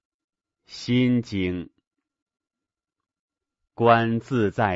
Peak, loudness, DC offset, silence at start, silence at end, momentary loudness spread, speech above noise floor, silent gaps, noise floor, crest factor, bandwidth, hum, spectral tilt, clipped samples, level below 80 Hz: -2 dBFS; -22 LUFS; under 0.1%; 0.7 s; 0 s; 16 LU; 66 dB; 1.87-1.91 s, 2.22-2.26 s, 3.19-3.28 s; -88 dBFS; 24 dB; 7.8 kHz; none; -7 dB/octave; under 0.1%; -58 dBFS